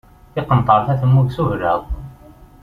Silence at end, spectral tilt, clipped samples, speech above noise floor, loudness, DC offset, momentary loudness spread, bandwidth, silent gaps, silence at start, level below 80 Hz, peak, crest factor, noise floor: 0.5 s; -9.5 dB/octave; under 0.1%; 27 dB; -17 LUFS; under 0.1%; 15 LU; 4.6 kHz; none; 0.35 s; -34 dBFS; -2 dBFS; 16 dB; -43 dBFS